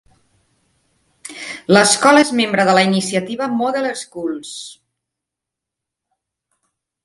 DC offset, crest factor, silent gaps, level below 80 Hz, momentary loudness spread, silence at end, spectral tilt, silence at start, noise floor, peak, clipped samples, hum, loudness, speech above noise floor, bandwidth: under 0.1%; 18 dB; none; -64 dBFS; 20 LU; 2.3 s; -3.5 dB/octave; 1.25 s; -83 dBFS; 0 dBFS; under 0.1%; none; -15 LUFS; 68 dB; 11.5 kHz